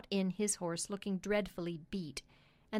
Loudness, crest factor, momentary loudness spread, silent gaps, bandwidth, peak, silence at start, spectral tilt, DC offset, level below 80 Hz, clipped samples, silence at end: -38 LUFS; 16 dB; 8 LU; none; 16 kHz; -22 dBFS; 0.05 s; -4.5 dB/octave; under 0.1%; -64 dBFS; under 0.1%; 0 s